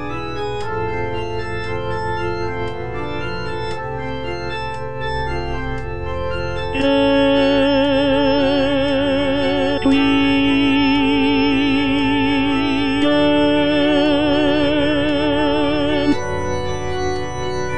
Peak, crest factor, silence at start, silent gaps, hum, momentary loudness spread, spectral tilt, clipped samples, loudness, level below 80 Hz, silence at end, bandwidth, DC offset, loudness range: -4 dBFS; 14 dB; 0 s; none; none; 10 LU; -6 dB/octave; under 0.1%; -18 LUFS; -36 dBFS; 0 s; 9.4 kHz; 4%; 9 LU